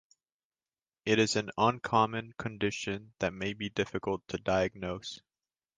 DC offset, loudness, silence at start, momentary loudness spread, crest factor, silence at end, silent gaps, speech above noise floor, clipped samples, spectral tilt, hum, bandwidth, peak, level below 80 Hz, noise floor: under 0.1%; -32 LUFS; 1.05 s; 12 LU; 22 dB; 0.6 s; none; over 58 dB; under 0.1%; -4.5 dB/octave; none; 9.8 kHz; -12 dBFS; -60 dBFS; under -90 dBFS